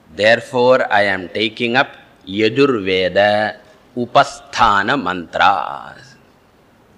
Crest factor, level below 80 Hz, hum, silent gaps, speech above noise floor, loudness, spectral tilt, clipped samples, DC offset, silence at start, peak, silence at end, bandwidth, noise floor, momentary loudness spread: 16 dB; -48 dBFS; none; none; 35 dB; -15 LUFS; -4.5 dB/octave; under 0.1%; under 0.1%; 0.15 s; 0 dBFS; 1.05 s; 11.5 kHz; -51 dBFS; 9 LU